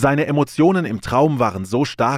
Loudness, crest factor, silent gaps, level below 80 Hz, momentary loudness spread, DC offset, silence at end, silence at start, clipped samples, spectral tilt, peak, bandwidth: -18 LUFS; 12 dB; none; -46 dBFS; 5 LU; under 0.1%; 0 s; 0 s; under 0.1%; -7 dB/octave; -4 dBFS; 15 kHz